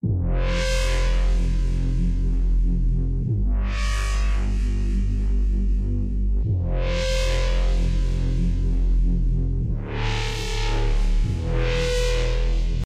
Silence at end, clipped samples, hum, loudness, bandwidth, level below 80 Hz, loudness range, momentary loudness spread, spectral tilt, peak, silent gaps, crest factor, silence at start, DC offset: 0 s; under 0.1%; none; -25 LUFS; 9.8 kHz; -22 dBFS; 1 LU; 2 LU; -5.5 dB/octave; -12 dBFS; none; 10 dB; 0.05 s; under 0.1%